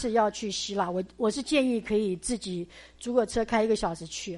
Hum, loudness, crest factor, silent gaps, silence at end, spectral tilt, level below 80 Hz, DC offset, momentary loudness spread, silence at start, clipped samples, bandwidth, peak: none; -28 LUFS; 16 dB; none; 0 s; -4 dB/octave; -52 dBFS; under 0.1%; 10 LU; 0 s; under 0.1%; 11.5 kHz; -12 dBFS